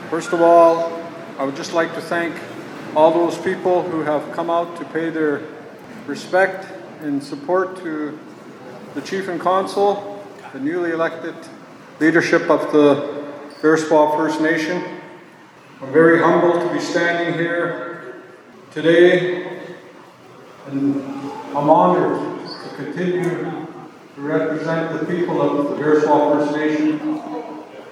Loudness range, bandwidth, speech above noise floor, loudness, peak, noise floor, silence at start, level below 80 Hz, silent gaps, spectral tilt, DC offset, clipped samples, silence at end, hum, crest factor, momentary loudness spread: 6 LU; 12.5 kHz; 26 dB; -18 LUFS; 0 dBFS; -44 dBFS; 0 s; -76 dBFS; none; -6 dB/octave; under 0.1%; under 0.1%; 0 s; none; 20 dB; 20 LU